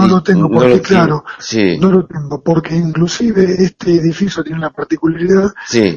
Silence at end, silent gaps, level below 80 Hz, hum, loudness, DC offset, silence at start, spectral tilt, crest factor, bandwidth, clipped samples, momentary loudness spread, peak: 0 s; none; -42 dBFS; none; -13 LUFS; under 0.1%; 0 s; -6.5 dB/octave; 12 dB; 7.4 kHz; 0.1%; 9 LU; 0 dBFS